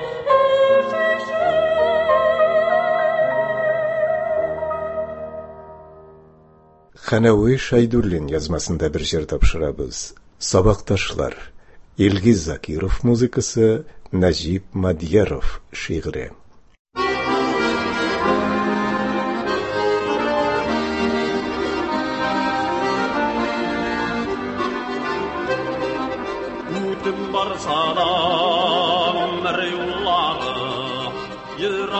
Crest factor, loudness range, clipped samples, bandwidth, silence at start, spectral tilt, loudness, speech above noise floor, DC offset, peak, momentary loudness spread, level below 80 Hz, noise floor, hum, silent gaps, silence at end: 18 dB; 5 LU; under 0.1%; 8.4 kHz; 0 s; -5 dB/octave; -20 LUFS; 32 dB; under 0.1%; -2 dBFS; 10 LU; -36 dBFS; -50 dBFS; none; 16.79-16.85 s; 0 s